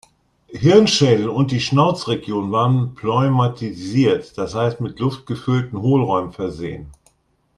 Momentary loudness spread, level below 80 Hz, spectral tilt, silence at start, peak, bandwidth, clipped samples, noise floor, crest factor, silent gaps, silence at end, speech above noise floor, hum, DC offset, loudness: 12 LU; -50 dBFS; -6.5 dB/octave; 0.5 s; 0 dBFS; 10.5 kHz; under 0.1%; -62 dBFS; 18 dB; none; 0.65 s; 45 dB; none; under 0.1%; -18 LUFS